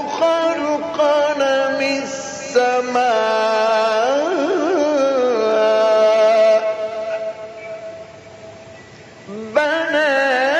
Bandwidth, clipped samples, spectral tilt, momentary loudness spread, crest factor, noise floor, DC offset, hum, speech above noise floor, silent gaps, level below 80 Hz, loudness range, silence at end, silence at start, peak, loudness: 9 kHz; under 0.1%; -3 dB/octave; 17 LU; 14 dB; -40 dBFS; under 0.1%; none; 24 dB; none; -64 dBFS; 7 LU; 0 s; 0 s; -4 dBFS; -17 LUFS